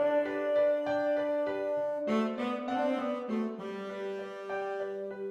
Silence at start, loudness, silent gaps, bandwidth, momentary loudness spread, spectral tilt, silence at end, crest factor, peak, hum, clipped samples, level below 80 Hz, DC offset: 0 s; -32 LUFS; none; 8.4 kHz; 10 LU; -6.5 dB/octave; 0 s; 12 dB; -18 dBFS; none; under 0.1%; -76 dBFS; under 0.1%